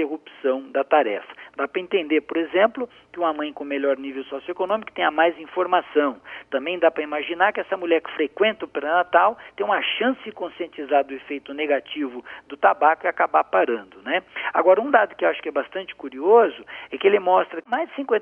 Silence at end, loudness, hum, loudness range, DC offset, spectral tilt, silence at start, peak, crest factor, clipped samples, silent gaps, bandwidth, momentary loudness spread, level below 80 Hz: 0 s; -22 LUFS; none; 4 LU; under 0.1%; -6.5 dB/octave; 0 s; -2 dBFS; 20 dB; under 0.1%; none; 3.7 kHz; 14 LU; -70 dBFS